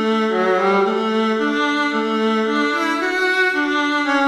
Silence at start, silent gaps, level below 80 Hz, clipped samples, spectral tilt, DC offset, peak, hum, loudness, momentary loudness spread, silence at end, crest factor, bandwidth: 0 s; none; -68 dBFS; under 0.1%; -4.5 dB/octave; under 0.1%; -4 dBFS; none; -18 LUFS; 3 LU; 0 s; 14 dB; 13.5 kHz